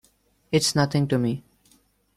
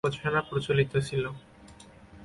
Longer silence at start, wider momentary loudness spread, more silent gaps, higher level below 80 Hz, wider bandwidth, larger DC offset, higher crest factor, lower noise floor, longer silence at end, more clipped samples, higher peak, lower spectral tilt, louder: first, 0.5 s vs 0.05 s; second, 7 LU vs 10 LU; neither; about the same, -58 dBFS vs -56 dBFS; first, 13.5 kHz vs 11.5 kHz; neither; about the same, 18 dB vs 20 dB; first, -62 dBFS vs -51 dBFS; first, 0.75 s vs 0 s; neither; about the same, -8 dBFS vs -10 dBFS; about the same, -5 dB/octave vs -6 dB/octave; first, -23 LUFS vs -29 LUFS